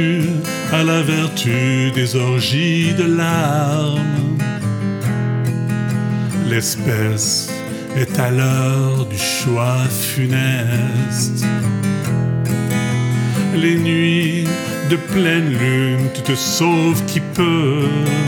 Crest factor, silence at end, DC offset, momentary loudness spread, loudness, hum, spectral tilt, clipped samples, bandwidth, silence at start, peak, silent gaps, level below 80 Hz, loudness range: 16 dB; 0 s; under 0.1%; 4 LU; -17 LUFS; none; -5 dB/octave; under 0.1%; 19 kHz; 0 s; -2 dBFS; none; -52 dBFS; 2 LU